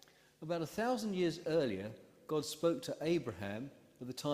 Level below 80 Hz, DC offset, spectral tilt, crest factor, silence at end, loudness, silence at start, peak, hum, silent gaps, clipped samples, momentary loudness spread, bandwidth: -74 dBFS; under 0.1%; -5.5 dB/octave; 18 dB; 0 s; -38 LUFS; 0.4 s; -20 dBFS; none; none; under 0.1%; 14 LU; 15.5 kHz